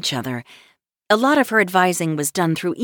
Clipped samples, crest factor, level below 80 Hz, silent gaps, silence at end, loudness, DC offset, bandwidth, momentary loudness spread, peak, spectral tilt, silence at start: under 0.1%; 16 dB; -64 dBFS; none; 0 s; -18 LUFS; under 0.1%; over 20 kHz; 10 LU; -4 dBFS; -4 dB/octave; 0 s